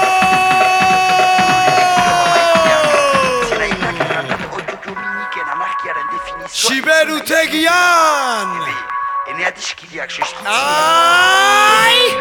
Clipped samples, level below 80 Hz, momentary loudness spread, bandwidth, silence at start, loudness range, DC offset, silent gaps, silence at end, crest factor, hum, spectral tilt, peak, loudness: under 0.1%; -48 dBFS; 13 LU; 19 kHz; 0 s; 6 LU; under 0.1%; none; 0 s; 14 dB; none; -2 dB/octave; 0 dBFS; -13 LUFS